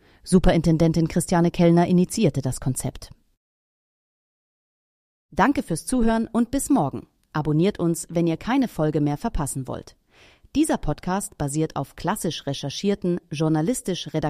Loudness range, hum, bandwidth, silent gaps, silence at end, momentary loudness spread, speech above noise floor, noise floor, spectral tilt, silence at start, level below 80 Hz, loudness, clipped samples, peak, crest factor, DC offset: 6 LU; none; 15.5 kHz; 3.37-5.29 s; 0 s; 10 LU; 32 dB; -54 dBFS; -6 dB/octave; 0.25 s; -38 dBFS; -23 LUFS; under 0.1%; -4 dBFS; 18 dB; under 0.1%